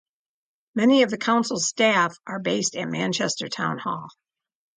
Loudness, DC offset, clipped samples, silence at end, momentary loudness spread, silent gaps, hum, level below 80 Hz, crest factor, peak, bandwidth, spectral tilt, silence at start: -23 LUFS; under 0.1%; under 0.1%; 0.65 s; 11 LU; none; none; -72 dBFS; 18 dB; -6 dBFS; 9.6 kHz; -3.5 dB/octave; 0.75 s